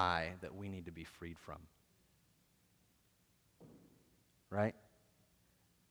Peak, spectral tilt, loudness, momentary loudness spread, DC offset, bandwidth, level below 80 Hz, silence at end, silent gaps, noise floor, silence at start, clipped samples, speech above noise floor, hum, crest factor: -18 dBFS; -6 dB/octave; -43 LUFS; 23 LU; under 0.1%; over 20 kHz; -68 dBFS; 1.1 s; none; -75 dBFS; 0 s; under 0.1%; 33 dB; none; 28 dB